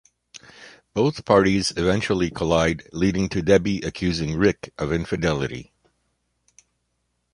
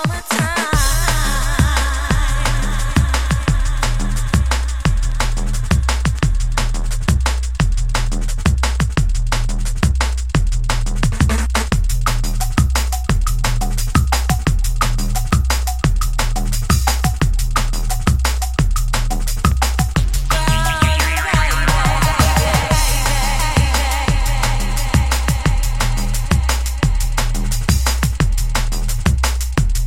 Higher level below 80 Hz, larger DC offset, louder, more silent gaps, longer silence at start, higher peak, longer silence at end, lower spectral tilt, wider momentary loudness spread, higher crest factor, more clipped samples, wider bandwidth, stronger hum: second, -42 dBFS vs -18 dBFS; second, under 0.1% vs 2%; second, -22 LUFS vs -18 LUFS; neither; first, 0.35 s vs 0 s; about the same, -2 dBFS vs 0 dBFS; first, 1.7 s vs 0 s; first, -5.5 dB/octave vs -4 dB/octave; first, 9 LU vs 5 LU; first, 20 dB vs 14 dB; neither; second, 11.5 kHz vs 16.5 kHz; first, 60 Hz at -50 dBFS vs none